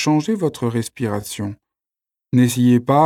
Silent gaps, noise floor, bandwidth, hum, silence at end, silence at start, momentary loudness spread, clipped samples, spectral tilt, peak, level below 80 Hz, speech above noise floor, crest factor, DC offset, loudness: none; -88 dBFS; 16 kHz; none; 0 s; 0 s; 13 LU; under 0.1%; -6.5 dB/octave; -2 dBFS; -58 dBFS; 71 dB; 16 dB; under 0.1%; -19 LUFS